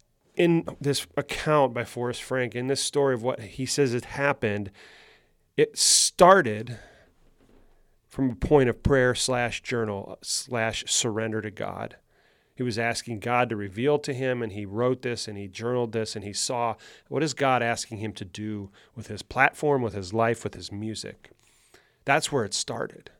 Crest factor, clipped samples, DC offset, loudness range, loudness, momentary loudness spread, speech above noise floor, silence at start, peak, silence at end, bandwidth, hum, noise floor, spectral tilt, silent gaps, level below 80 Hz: 24 dB; under 0.1%; under 0.1%; 6 LU; -25 LUFS; 14 LU; 38 dB; 0.35 s; -2 dBFS; 0.3 s; 17.5 kHz; none; -64 dBFS; -3.5 dB/octave; none; -50 dBFS